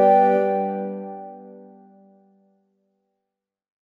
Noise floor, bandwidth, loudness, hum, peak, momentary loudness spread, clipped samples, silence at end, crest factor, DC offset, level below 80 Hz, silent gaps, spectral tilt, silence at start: -84 dBFS; 5 kHz; -21 LUFS; none; -6 dBFS; 25 LU; under 0.1%; 2.3 s; 18 dB; under 0.1%; -74 dBFS; none; -9 dB/octave; 0 s